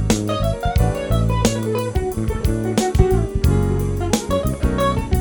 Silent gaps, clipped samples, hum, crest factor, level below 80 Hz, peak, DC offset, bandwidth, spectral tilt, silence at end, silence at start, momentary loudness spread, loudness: none; under 0.1%; none; 16 dB; -24 dBFS; -2 dBFS; under 0.1%; over 20 kHz; -6 dB/octave; 0 s; 0 s; 4 LU; -20 LUFS